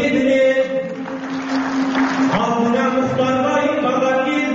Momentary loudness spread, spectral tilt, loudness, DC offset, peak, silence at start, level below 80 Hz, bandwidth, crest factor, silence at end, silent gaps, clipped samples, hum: 9 LU; -4 dB/octave; -18 LUFS; under 0.1%; -4 dBFS; 0 s; -54 dBFS; 7.8 kHz; 12 dB; 0 s; none; under 0.1%; none